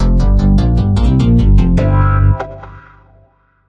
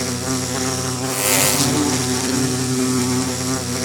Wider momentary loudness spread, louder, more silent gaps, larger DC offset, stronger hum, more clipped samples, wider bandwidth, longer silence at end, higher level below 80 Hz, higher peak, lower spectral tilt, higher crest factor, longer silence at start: about the same, 7 LU vs 7 LU; first, -12 LUFS vs -18 LUFS; neither; neither; first, 50 Hz at -20 dBFS vs none; neither; second, 7.2 kHz vs over 20 kHz; first, 0.9 s vs 0 s; first, -14 dBFS vs -52 dBFS; about the same, -2 dBFS vs 0 dBFS; first, -9 dB/octave vs -3.5 dB/octave; second, 10 dB vs 18 dB; about the same, 0 s vs 0 s